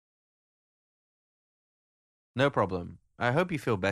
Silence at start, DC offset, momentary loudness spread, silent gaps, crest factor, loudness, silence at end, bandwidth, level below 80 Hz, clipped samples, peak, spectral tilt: 2.35 s; under 0.1%; 13 LU; none; 22 dB; -29 LUFS; 0 s; 13 kHz; -64 dBFS; under 0.1%; -10 dBFS; -6.5 dB/octave